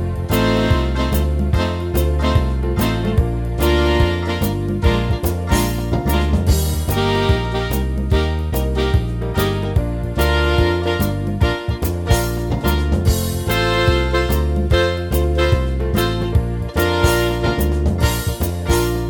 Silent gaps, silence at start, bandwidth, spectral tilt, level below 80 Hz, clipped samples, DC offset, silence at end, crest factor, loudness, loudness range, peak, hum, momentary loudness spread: none; 0 s; 19 kHz; -6 dB/octave; -22 dBFS; under 0.1%; under 0.1%; 0 s; 16 dB; -18 LUFS; 1 LU; 0 dBFS; none; 4 LU